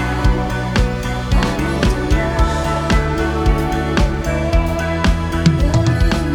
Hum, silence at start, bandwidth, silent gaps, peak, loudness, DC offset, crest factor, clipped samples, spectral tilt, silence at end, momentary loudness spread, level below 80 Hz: none; 0 s; 17 kHz; none; 0 dBFS; -17 LUFS; under 0.1%; 16 dB; under 0.1%; -6 dB/octave; 0 s; 3 LU; -20 dBFS